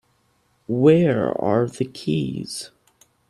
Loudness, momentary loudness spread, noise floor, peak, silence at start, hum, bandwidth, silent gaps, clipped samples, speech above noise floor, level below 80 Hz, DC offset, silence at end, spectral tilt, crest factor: -21 LUFS; 16 LU; -64 dBFS; -2 dBFS; 0.7 s; none; 13 kHz; none; under 0.1%; 45 dB; -58 dBFS; under 0.1%; 0.65 s; -7 dB/octave; 20 dB